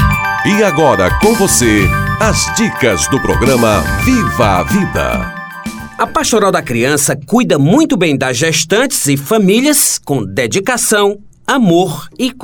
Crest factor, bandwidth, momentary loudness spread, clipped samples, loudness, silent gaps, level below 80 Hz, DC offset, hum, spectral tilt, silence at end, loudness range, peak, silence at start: 12 dB; over 20 kHz; 7 LU; under 0.1%; -11 LUFS; none; -28 dBFS; under 0.1%; none; -4 dB/octave; 0 s; 2 LU; 0 dBFS; 0 s